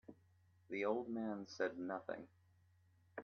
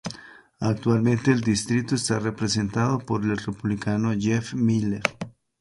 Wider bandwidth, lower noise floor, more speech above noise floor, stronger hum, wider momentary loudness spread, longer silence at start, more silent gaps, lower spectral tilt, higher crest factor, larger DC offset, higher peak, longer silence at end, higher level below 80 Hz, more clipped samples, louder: second, 6.8 kHz vs 11.5 kHz; first, -73 dBFS vs -45 dBFS; first, 29 dB vs 21 dB; neither; first, 16 LU vs 7 LU; about the same, 0.1 s vs 0.05 s; neither; about the same, -4.5 dB/octave vs -5.5 dB/octave; about the same, 20 dB vs 24 dB; neither; second, -26 dBFS vs 0 dBFS; second, 0 s vs 0.3 s; second, -88 dBFS vs -52 dBFS; neither; second, -44 LUFS vs -24 LUFS